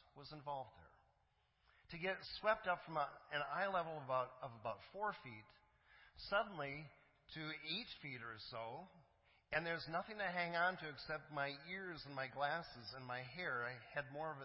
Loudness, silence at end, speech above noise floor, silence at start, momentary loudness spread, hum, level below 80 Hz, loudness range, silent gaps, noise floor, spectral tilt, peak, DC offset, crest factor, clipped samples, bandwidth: -45 LUFS; 0 s; 35 dB; 0.15 s; 13 LU; none; -74 dBFS; 4 LU; none; -80 dBFS; -2 dB/octave; -24 dBFS; under 0.1%; 22 dB; under 0.1%; 5.6 kHz